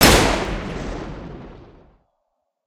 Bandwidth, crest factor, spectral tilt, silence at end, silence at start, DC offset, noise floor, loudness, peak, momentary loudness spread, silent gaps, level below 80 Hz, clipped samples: 16 kHz; 22 dB; -3.5 dB/octave; 1.05 s; 0 s; under 0.1%; -74 dBFS; -20 LUFS; 0 dBFS; 24 LU; none; -30 dBFS; under 0.1%